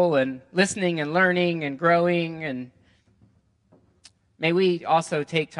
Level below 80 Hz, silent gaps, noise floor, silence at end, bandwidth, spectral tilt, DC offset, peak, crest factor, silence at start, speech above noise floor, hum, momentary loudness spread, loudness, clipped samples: -68 dBFS; none; -61 dBFS; 0 s; 11.5 kHz; -5 dB/octave; under 0.1%; -6 dBFS; 18 dB; 0 s; 39 dB; none; 10 LU; -23 LUFS; under 0.1%